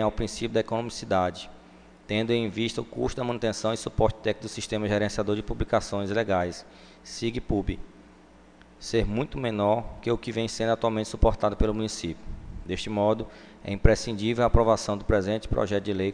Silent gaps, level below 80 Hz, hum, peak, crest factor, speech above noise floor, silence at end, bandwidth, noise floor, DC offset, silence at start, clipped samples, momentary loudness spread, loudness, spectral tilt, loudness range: none; -36 dBFS; none; 0 dBFS; 26 dB; 27 dB; 0 s; 10 kHz; -53 dBFS; under 0.1%; 0 s; under 0.1%; 11 LU; -27 LUFS; -5.5 dB/octave; 4 LU